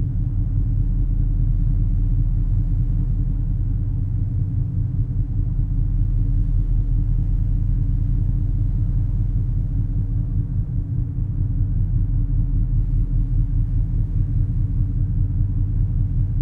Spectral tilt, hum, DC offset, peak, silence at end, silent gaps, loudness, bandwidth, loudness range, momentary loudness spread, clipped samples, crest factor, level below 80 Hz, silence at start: -12 dB/octave; none; under 0.1%; -8 dBFS; 0 s; none; -23 LUFS; 1.3 kHz; 1 LU; 2 LU; under 0.1%; 12 dB; -22 dBFS; 0 s